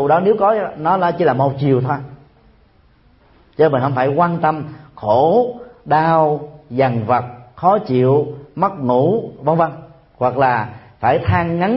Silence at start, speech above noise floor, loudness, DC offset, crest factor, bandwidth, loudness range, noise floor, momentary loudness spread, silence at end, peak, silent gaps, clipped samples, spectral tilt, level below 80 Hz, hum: 0 s; 37 dB; -17 LUFS; under 0.1%; 16 dB; 5.8 kHz; 3 LU; -52 dBFS; 11 LU; 0 s; -2 dBFS; none; under 0.1%; -12.5 dB/octave; -48 dBFS; none